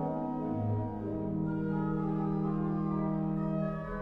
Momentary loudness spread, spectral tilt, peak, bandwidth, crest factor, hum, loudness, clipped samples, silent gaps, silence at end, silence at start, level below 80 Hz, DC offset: 3 LU; -11.5 dB/octave; -22 dBFS; 4 kHz; 12 dB; none; -33 LUFS; under 0.1%; none; 0 s; 0 s; -50 dBFS; under 0.1%